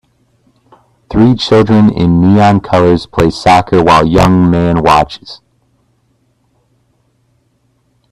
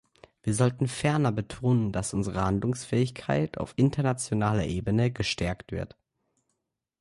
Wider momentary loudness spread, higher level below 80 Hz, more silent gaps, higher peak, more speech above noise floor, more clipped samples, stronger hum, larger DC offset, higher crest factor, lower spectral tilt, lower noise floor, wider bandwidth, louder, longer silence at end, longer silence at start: about the same, 5 LU vs 6 LU; first, -32 dBFS vs -48 dBFS; neither; first, 0 dBFS vs -12 dBFS; second, 49 dB vs 55 dB; neither; neither; neither; second, 10 dB vs 16 dB; about the same, -7 dB/octave vs -6 dB/octave; second, -57 dBFS vs -82 dBFS; first, 13 kHz vs 11.5 kHz; first, -9 LUFS vs -28 LUFS; first, 2.75 s vs 1.15 s; first, 1.1 s vs 0.45 s